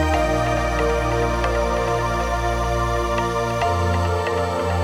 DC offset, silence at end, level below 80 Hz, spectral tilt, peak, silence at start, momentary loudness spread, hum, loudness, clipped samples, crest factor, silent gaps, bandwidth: under 0.1%; 0 s; -28 dBFS; -5.5 dB/octave; -8 dBFS; 0 s; 2 LU; none; -21 LUFS; under 0.1%; 12 dB; none; 16.5 kHz